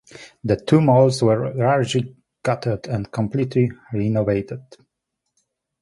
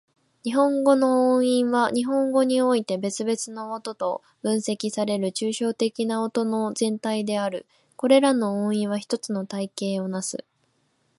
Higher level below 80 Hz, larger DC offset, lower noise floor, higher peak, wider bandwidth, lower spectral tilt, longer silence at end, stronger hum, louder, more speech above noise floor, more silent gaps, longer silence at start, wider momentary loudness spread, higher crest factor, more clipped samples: first, -50 dBFS vs -74 dBFS; neither; first, -79 dBFS vs -69 dBFS; first, -2 dBFS vs -6 dBFS; about the same, 11.5 kHz vs 11.5 kHz; first, -7 dB/octave vs -5 dB/octave; first, 1.2 s vs 0.8 s; neither; first, -20 LUFS vs -24 LUFS; first, 60 dB vs 45 dB; neither; second, 0.15 s vs 0.45 s; about the same, 12 LU vs 11 LU; about the same, 18 dB vs 18 dB; neither